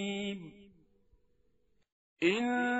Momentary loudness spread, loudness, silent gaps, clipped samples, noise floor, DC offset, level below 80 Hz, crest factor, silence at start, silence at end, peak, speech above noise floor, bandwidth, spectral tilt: 16 LU; -33 LUFS; 1.92-2.16 s; under 0.1%; -75 dBFS; under 0.1%; -72 dBFS; 22 dB; 0 s; 0 s; -14 dBFS; 42 dB; 8 kHz; -3 dB/octave